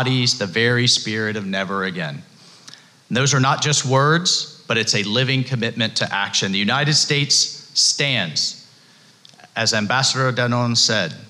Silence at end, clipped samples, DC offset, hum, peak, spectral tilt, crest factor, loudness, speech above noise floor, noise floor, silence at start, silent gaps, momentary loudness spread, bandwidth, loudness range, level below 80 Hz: 0.05 s; under 0.1%; under 0.1%; none; -6 dBFS; -3 dB/octave; 14 dB; -18 LUFS; 31 dB; -50 dBFS; 0 s; none; 8 LU; 12.5 kHz; 3 LU; -64 dBFS